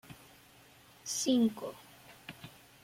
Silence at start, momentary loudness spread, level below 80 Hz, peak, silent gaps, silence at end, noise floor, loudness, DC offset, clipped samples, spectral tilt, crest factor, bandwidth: 0.1 s; 25 LU; -74 dBFS; -18 dBFS; none; 0.35 s; -60 dBFS; -32 LUFS; under 0.1%; under 0.1%; -3.5 dB/octave; 20 dB; 16.5 kHz